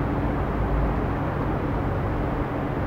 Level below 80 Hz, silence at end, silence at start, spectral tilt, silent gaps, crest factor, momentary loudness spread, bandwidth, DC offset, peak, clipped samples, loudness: -30 dBFS; 0 s; 0 s; -9.5 dB/octave; none; 12 dB; 2 LU; 6.4 kHz; under 0.1%; -12 dBFS; under 0.1%; -26 LUFS